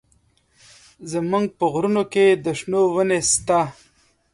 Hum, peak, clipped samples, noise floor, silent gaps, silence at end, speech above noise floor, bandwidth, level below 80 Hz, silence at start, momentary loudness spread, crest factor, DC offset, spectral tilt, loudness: none; -6 dBFS; under 0.1%; -61 dBFS; none; 0.6 s; 42 dB; 11.5 kHz; -56 dBFS; 1 s; 10 LU; 16 dB; under 0.1%; -4 dB/octave; -20 LUFS